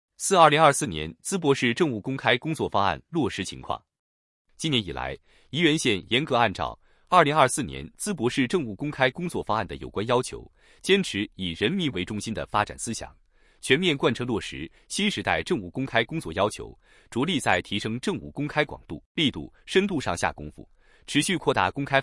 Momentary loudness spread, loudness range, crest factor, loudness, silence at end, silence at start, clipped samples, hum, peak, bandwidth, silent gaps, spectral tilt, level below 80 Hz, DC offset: 13 LU; 4 LU; 22 dB; -25 LUFS; 0 s; 0.2 s; under 0.1%; none; -4 dBFS; 12 kHz; 3.99-4.45 s, 19.06-19.15 s; -4 dB/octave; -52 dBFS; under 0.1%